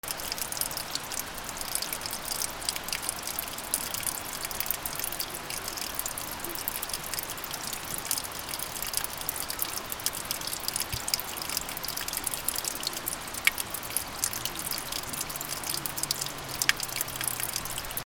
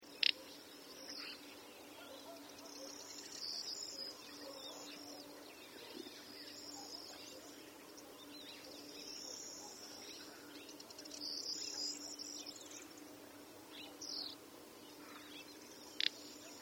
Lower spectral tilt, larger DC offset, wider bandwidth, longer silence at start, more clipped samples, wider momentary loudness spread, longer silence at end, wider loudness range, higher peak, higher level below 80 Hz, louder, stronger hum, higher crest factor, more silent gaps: about the same, -0.5 dB/octave vs -0.5 dB/octave; neither; about the same, over 20 kHz vs over 20 kHz; about the same, 0.05 s vs 0 s; neither; second, 5 LU vs 13 LU; about the same, 0.05 s vs 0 s; second, 2 LU vs 6 LU; first, -2 dBFS vs -16 dBFS; first, -52 dBFS vs -86 dBFS; first, -31 LUFS vs -47 LUFS; neither; about the same, 32 dB vs 34 dB; neither